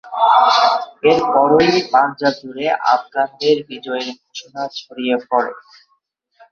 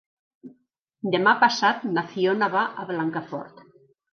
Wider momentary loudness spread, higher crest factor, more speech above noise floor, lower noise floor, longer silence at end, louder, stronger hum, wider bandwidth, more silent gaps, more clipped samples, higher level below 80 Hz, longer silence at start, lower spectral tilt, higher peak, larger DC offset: about the same, 14 LU vs 16 LU; second, 16 dB vs 22 dB; first, 49 dB vs 45 dB; about the same, -65 dBFS vs -68 dBFS; first, 0.9 s vs 0.65 s; first, -16 LUFS vs -23 LUFS; neither; about the same, 7.2 kHz vs 7 kHz; second, none vs 0.82-0.87 s; neither; first, -58 dBFS vs -78 dBFS; second, 0.05 s vs 0.45 s; about the same, -4.5 dB/octave vs -4.5 dB/octave; first, 0 dBFS vs -4 dBFS; neither